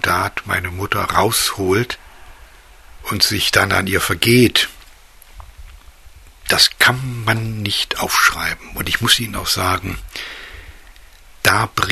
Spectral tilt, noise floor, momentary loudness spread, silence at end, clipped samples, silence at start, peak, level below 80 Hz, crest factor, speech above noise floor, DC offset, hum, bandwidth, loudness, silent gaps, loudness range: -3 dB/octave; -43 dBFS; 15 LU; 0 s; under 0.1%; 0.05 s; 0 dBFS; -40 dBFS; 18 dB; 26 dB; under 0.1%; none; 14 kHz; -16 LUFS; none; 3 LU